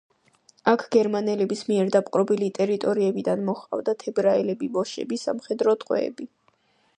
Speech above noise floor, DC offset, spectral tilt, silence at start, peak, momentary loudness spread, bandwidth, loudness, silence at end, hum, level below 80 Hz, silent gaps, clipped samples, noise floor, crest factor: 41 dB; under 0.1%; -6 dB/octave; 0.65 s; -6 dBFS; 7 LU; 9.8 kHz; -24 LUFS; 0.7 s; none; -74 dBFS; none; under 0.1%; -65 dBFS; 20 dB